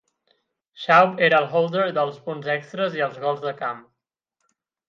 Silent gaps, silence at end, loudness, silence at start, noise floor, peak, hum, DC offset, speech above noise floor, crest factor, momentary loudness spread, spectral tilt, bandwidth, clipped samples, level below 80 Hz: none; 1.1 s; -21 LUFS; 0.8 s; -80 dBFS; -2 dBFS; none; under 0.1%; 58 dB; 20 dB; 14 LU; -6 dB/octave; 7.2 kHz; under 0.1%; -76 dBFS